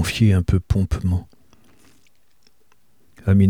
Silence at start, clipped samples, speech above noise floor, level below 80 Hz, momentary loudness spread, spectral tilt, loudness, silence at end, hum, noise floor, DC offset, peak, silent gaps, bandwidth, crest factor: 0 s; under 0.1%; 44 dB; -34 dBFS; 9 LU; -7 dB/octave; -21 LUFS; 0 s; none; -63 dBFS; 0.3%; -4 dBFS; none; 15.5 kHz; 16 dB